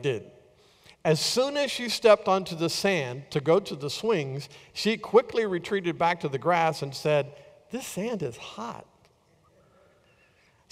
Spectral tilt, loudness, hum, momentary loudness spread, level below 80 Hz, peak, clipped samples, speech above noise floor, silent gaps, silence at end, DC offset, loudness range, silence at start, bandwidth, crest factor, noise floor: -4.5 dB/octave; -26 LUFS; none; 15 LU; -66 dBFS; -8 dBFS; under 0.1%; 37 dB; none; 1.9 s; under 0.1%; 8 LU; 0 s; 16 kHz; 20 dB; -63 dBFS